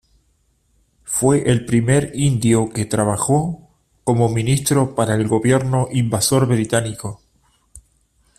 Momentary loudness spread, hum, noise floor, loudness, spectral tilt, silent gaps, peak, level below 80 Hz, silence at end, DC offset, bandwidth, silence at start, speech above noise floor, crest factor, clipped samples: 7 LU; none; -62 dBFS; -18 LUFS; -5.5 dB/octave; none; -2 dBFS; -46 dBFS; 0.6 s; under 0.1%; 15 kHz; 1.05 s; 45 dB; 16 dB; under 0.1%